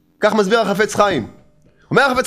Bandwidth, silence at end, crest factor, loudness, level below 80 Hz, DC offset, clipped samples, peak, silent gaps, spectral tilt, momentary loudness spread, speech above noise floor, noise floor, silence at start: 15.5 kHz; 0 s; 18 dB; -16 LUFS; -50 dBFS; under 0.1%; under 0.1%; 0 dBFS; none; -4.5 dB/octave; 6 LU; 37 dB; -52 dBFS; 0.2 s